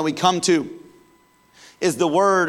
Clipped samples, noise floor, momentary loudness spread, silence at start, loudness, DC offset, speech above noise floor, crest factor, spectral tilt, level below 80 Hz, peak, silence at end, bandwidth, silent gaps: under 0.1%; -56 dBFS; 7 LU; 0 s; -20 LUFS; under 0.1%; 38 dB; 16 dB; -4 dB/octave; -70 dBFS; -6 dBFS; 0 s; 14.5 kHz; none